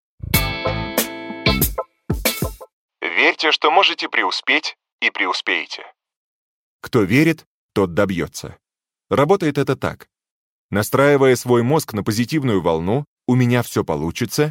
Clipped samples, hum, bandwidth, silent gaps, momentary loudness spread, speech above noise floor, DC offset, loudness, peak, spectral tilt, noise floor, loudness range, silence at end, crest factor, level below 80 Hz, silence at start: under 0.1%; none; 17 kHz; 2.73-2.89 s, 4.92-4.99 s, 6.16-6.80 s, 7.47-7.69 s, 10.31-10.69 s, 13.07-13.17 s; 12 LU; 42 dB; under 0.1%; -18 LUFS; -2 dBFS; -4.5 dB/octave; -60 dBFS; 4 LU; 0 s; 18 dB; -38 dBFS; 0.25 s